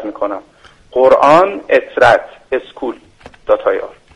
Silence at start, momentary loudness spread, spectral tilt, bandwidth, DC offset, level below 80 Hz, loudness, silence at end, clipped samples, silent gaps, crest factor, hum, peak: 0 s; 16 LU; -5 dB/octave; 10.5 kHz; under 0.1%; -48 dBFS; -13 LUFS; 0.25 s; under 0.1%; none; 14 dB; none; 0 dBFS